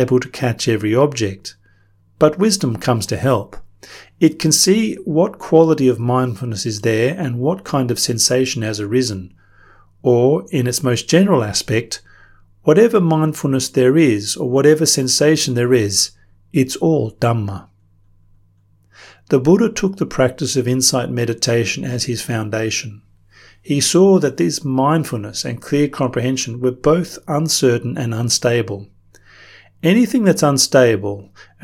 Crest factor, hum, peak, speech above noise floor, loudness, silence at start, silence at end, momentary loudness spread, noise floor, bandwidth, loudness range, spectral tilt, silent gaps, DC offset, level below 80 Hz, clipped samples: 16 dB; none; 0 dBFS; 38 dB; -16 LUFS; 0 s; 0.2 s; 9 LU; -54 dBFS; 17.5 kHz; 4 LU; -4.5 dB/octave; none; under 0.1%; -50 dBFS; under 0.1%